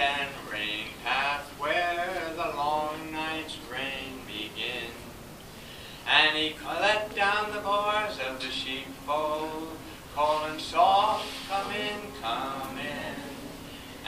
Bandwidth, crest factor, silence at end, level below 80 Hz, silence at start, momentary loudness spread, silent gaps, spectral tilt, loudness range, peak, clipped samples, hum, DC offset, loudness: 15.5 kHz; 22 dB; 0 s; -56 dBFS; 0 s; 16 LU; none; -3 dB/octave; 6 LU; -8 dBFS; under 0.1%; none; under 0.1%; -29 LUFS